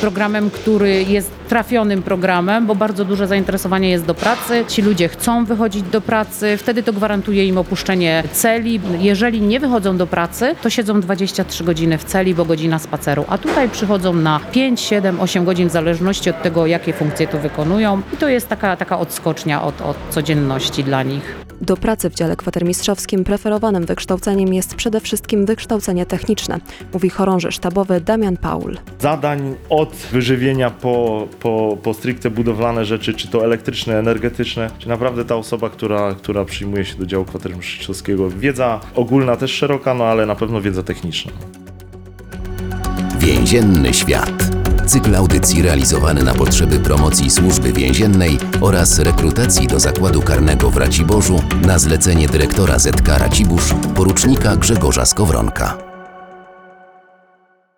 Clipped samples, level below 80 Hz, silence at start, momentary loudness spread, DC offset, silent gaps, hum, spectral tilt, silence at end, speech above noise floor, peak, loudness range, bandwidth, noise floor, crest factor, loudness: under 0.1%; -26 dBFS; 0 s; 8 LU; under 0.1%; none; none; -5 dB/octave; 1.25 s; 40 dB; -2 dBFS; 6 LU; over 20 kHz; -55 dBFS; 12 dB; -16 LUFS